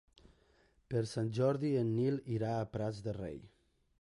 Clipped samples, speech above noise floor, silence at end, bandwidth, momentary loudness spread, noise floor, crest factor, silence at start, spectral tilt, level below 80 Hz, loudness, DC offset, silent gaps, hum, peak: under 0.1%; 35 dB; 0.55 s; 11.5 kHz; 10 LU; -70 dBFS; 16 dB; 0.9 s; -8 dB/octave; -64 dBFS; -36 LUFS; under 0.1%; none; none; -22 dBFS